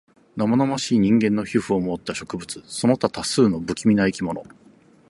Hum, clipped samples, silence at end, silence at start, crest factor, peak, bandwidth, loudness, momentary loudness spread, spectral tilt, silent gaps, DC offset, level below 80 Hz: none; under 0.1%; 0.65 s; 0.35 s; 18 dB; -4 dBFS; 11.5 kHz; -22 LUFS; 13 LU; -5.5 dB/octave; none; under 0.1%; -52 dBFS